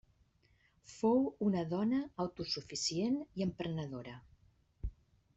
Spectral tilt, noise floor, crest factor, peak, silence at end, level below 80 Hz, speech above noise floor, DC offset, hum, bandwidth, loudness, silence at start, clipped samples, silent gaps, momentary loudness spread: -5.5 dB/octave; -72 dBFS; 18 dB; -20 dBFS; 0.45 s; -56 dBFS; 36 dB; under 0.1%; none; 8.2 kHz; -36 LUFS; 0.9 s; under 0.1%; none; 16 LU